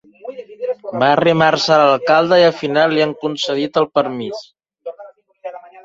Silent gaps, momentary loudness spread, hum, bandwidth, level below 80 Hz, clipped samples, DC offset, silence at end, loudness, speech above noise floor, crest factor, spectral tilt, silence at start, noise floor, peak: none; 20 LU; none; 7.8 kHz; -60 dBFS; under 0.1%; under 0.1%; 0.25 s; -15 LUFS; 27 dB; 16 dB; -5 dB/octave; 0.25 s; -41 dBFS; 0 dBFS